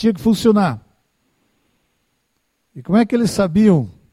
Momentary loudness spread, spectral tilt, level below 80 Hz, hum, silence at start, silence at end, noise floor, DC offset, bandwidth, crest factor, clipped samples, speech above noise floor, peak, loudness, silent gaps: 7 LU; -7 dB/octave; -48 dBFS; none; 0 s; 0.2 s; -68 dBFS; under 0.1%; 14.5 kHz; 16 dB; under 0.1%; 53 dB; -2 dBFS; -16 LUFS; none